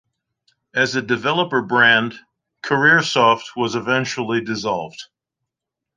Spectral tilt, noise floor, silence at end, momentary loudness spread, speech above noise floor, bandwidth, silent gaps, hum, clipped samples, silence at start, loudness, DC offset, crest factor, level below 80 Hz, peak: -4 dB/octave; -84 dBFS; 0.9 s; 13 LU; 66 dB; 9.8 kHz; none; none; under 0.1%; 0.75 s; -18 LUFS; under 0.1%; 18 dB; -64 dBFS; -2 dBFS